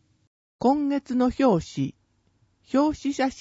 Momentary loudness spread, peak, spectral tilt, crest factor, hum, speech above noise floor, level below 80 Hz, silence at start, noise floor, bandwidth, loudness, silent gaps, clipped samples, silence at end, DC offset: 9 LU; -8 dBFS; -6.5 dB/octave; 18 dB; none; 43 dB; -52 dBFS; 0.6 s; -66 dBFS; 8 kHz; -24 LUFS; none; under 0.1%; 0 s; under 0.1%